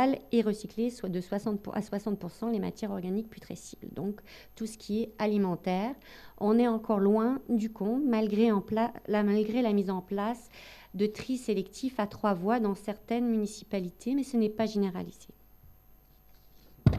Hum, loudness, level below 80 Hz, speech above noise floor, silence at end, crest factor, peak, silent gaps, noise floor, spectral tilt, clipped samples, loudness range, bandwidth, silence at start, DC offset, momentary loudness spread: none; -31 LUFS; -56 dBFS; 28 dB; 0 s; 20 dB; -10 dBFS; none; -58 dBFS; -7 dB/octave; under 0.1%; 7 LU; 13.5 kHz; 0 s; under 0.1%; 14 LU